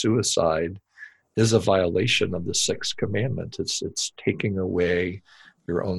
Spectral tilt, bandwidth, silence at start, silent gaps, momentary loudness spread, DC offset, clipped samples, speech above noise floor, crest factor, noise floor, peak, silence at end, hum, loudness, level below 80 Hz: -4 dB/octave; 12.5 kHz; 0 s; none; 10 LU; under 0.1%; under 0.1%; 24 dB; 18 dB; -48 dBFS; -6 dBFS; 0 s; none; -24 LUFS; -52 dBFS